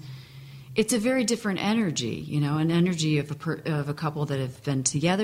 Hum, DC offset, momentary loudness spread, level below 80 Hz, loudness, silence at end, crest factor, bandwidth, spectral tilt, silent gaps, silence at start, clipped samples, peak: none; under 0.1%; 7 LU; -60 dBFS; -26 LUFS; 0 s; 16 dB; 15.5 kHz; -5 dB/octave; none; 0 s; under 0.1%; -10 dBFS